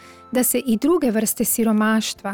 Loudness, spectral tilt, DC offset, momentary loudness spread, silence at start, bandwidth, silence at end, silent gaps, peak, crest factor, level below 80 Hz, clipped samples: -19 LUFS; -3.5 dB/octave; under 0.1%; 3 LU; 0.05 s; over 20 kHz; 0 s; none; -10 dBFS; 8 dB; -52 dBFS; under 0.1%